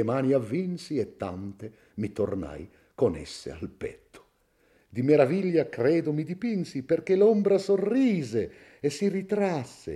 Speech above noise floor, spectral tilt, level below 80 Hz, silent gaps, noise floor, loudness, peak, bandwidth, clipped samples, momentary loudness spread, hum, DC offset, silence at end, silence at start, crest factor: 40 dB; -7 dB/octave; -60 dBFS; none; -66 dBFS; -27 LUFS; -8 dBFS; 12 kHz; under 0.1%; 17 LU; none; under 0.1%; 0 s; 0 s; 18 dB